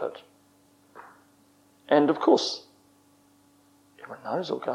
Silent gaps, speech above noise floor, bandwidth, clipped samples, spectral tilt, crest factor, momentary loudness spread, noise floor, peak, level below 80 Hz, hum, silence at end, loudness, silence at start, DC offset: none; 37 dB; 12.5 kHz; under 0.1%; -4.5 dB/octave; 22 dB; 24 LU; -61 dBFS; -6 dBFS; -82 dBFS; 50 Hz at -70 dBFS; 0 s; -25 LUFS; 0 s; under 0.1%